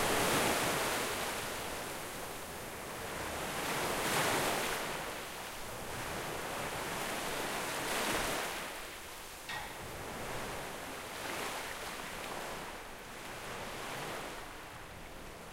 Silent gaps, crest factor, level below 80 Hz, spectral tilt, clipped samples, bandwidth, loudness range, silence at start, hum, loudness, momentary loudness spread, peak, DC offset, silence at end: none; 20 dB; -56 dBFS; -2.5 dB/octave; under 0.1%; 16 kHz; 6 LU; 0 s; none; -37 LUFS; 13 LU; -20 dBFS; under 0.1%; 0 s